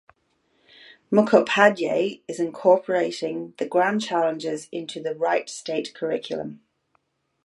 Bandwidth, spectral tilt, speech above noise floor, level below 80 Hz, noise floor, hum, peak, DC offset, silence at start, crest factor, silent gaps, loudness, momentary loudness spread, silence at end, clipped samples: 11.5 kHz; -4.5 dB/octave; 47 dB; -74 dBFS; -70 dBFS; none; -2 dBFS; under 0.1%; 1.1 s; 22 dB; none; -23 LUFS; 13 LU; 0.9 s; under 0.1%